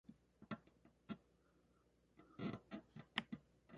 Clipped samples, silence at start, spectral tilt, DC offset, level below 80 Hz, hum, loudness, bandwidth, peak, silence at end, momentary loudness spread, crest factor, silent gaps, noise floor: under 0.1%; 0.1 s; -3.5 dB/octave; under 0.1%; -78 dBFS; 60 Hz at -75 dBFS; -52 LUFS; 7.4 kHz; -22 dBFS; 0 s; 15 LU; 34 dB; none; -77 dBFS